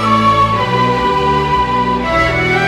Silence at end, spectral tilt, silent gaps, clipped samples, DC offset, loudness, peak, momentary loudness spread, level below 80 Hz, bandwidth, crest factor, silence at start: 0 s; -6 dB/octave; none; under 0.1%; under 0.1%; -13 LUFS; 0 dBFS; 3 LU; -30 dBFS; 14 kHz; 12 dB; 0 s